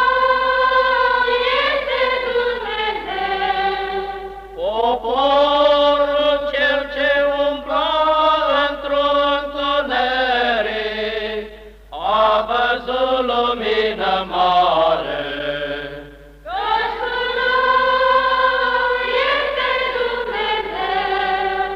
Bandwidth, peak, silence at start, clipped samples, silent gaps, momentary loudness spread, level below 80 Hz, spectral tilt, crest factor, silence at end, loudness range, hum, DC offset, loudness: 7.6 kHz; -4 dBFS; 0 s; under 0.1%; none; 9 LU; -44 dBFS; -4.5 dB/octave; 14 dB; 0 s; 3 LU; none; under 0.1%; -18 LUFS